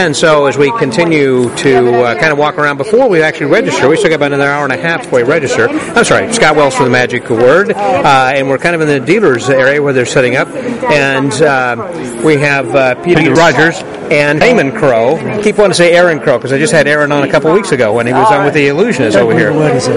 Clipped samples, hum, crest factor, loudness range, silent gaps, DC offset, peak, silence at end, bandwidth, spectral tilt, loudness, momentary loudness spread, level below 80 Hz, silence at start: 0.4%; none; 8 dB; 1 LU; none; 0.3%; 0 dBFS; 0 s; 11.5 kHz; -5 dB/octave; -9 LUFS; 4 LU; -44 dBFS; 0 s